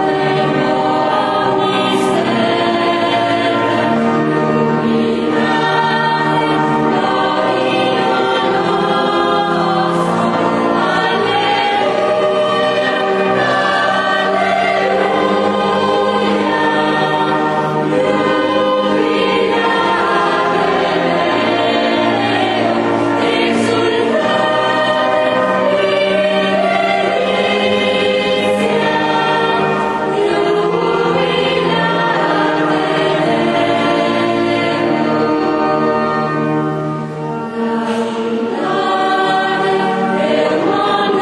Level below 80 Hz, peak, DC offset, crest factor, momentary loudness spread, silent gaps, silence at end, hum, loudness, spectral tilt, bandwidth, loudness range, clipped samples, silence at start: -52 dBFS; -2 dBFS; under 0.1%; 12 dB; 2 LU; none; 0 s; none; -14 LUFS; -5.5 dB/octave; 11.5 kHz; 1 LU; under 0.1%; 0 s